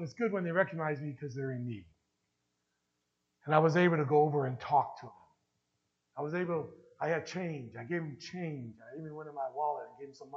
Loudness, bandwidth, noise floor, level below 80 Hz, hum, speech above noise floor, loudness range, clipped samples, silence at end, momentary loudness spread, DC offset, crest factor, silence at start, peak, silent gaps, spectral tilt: -33 LUFS; 7.6 kHz; -82 dBFS; -78 dBFS; none; 49 dB; 7 LU; under 0.1%; 0 s; 19 LU; under 0.1%; 24 dB; 0 s; -10 dBFS; none; -7.5 dB/octave